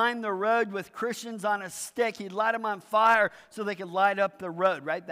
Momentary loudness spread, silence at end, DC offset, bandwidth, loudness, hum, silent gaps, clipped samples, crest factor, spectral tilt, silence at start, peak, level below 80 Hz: 10 LU; 0 s; under 0.1%; 16 kHz; -28 LUFS; none; none; under 0.1%; 16 dB; -3.5 dB/octave; 0 s; -10 dBFS; -78 dBFS